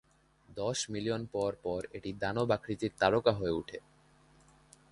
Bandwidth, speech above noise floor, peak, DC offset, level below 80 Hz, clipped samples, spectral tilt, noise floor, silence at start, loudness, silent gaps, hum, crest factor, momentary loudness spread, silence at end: 11.5 kHz; 31 dB; -10 dBFS; under 0.1%; -60 dBFS; under 0.1%; -5 dB/octave; -63 dBFS; 0.5 s; -33 LUFS; none; none; 24 dB; 11 LU; 1.15 s